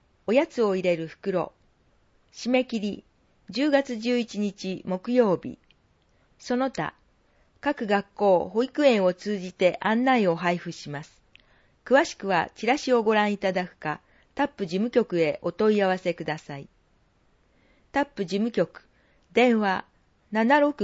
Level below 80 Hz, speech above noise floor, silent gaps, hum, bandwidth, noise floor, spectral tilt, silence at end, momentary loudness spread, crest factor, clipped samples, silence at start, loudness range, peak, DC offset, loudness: -64 dBFS; 40 dB; none; none; 8 kHz; -64 dBFS; -5.5 dB/octave; 0 s; 12 LU; 20 dB; under 0.1%; 0.3 s; 5 LU; -6 dBFS; under 0.1%; -25 LUFS